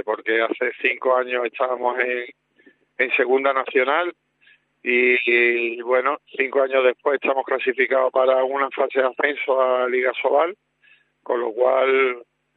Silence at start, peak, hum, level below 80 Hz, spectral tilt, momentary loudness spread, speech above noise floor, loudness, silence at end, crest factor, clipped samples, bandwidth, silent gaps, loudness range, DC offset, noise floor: 0.05 s; -4 dBFS; none; -84 dBFS; -6 dB/octave; 7 LU; 38 dB; -20 LUFS; 0.35 s; 18 dB; under 0.1%; 4.3 kHz; none; 3 LU; under 0.1%; -58 dBFS